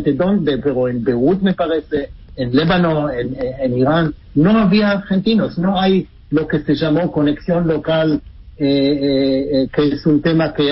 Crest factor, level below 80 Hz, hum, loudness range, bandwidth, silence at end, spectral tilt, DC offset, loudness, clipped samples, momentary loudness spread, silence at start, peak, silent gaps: 14 dB; -40 dBFS; none; 2 LU; 5.8 kHz; 0 s; -11 dB/octave; under 0.1%; -16 LUFS; under 0.1%; 7 LU; 0 s; -2 dBFS; none